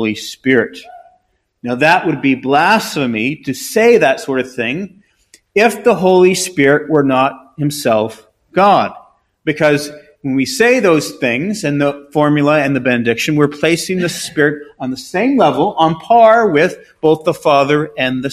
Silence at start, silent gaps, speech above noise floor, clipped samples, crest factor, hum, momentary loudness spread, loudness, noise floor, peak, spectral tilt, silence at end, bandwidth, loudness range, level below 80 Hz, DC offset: 0 s; none; 46 dB; 0.1%; 14 dB; none; 11 LU; -13 LUFS; -60 dBFS; 0 dBFS; -5 dB/octave; 0 s; 15.5 kHz; 2 LU; -54 dBFS; under 0.1%